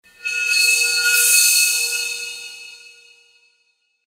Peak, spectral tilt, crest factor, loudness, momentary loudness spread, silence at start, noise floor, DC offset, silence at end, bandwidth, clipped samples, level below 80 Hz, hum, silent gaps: 0 dBFS; 6 dB/octave; 20 dB; -14 LUFS; 19 LU; 0.25 s; -66 dBFS; under 0.1%; 1.3 s; 16 kHz; under 0.1%; -76 dBFS; none; none